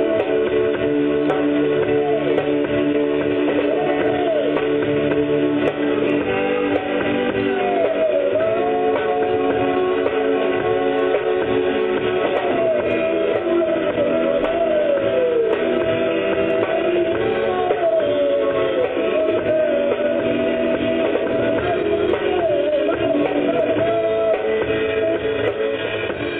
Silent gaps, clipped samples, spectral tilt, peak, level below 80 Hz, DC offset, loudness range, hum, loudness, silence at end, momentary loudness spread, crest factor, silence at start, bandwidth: none; under 0.1%; -8.5 dB/octave; -6 dBFS; -48 dBFS; under 0.1%; 1 LU; none; -19 LUFS; 0 s; 2 LU; 12 dB; 0 s; 4.1 kHz